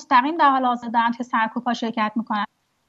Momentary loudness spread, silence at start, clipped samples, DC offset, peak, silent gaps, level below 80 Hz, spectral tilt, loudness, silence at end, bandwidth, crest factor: 8 LU; 0 s; under 0.1%; under 0.1%; -4 dBFS; none; -74 dBFS; -5 dB/octave; -21 LUFS; 0.45 s; 7.8 kHz; 18 dB